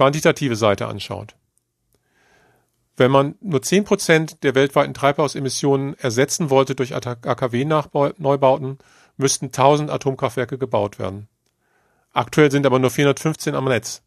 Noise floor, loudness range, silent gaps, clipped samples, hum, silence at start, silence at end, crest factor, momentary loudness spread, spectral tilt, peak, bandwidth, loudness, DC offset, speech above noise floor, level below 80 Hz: -69 dBFS; 3 LU; none; under 0.1%; none; 0 s; 0.1 s; 20 dB; 9 LU; -5 dB/octave; 0 dBFS; 14 kHz; -19 LUFS; under 0.1%; 50 dB; -58 dBFS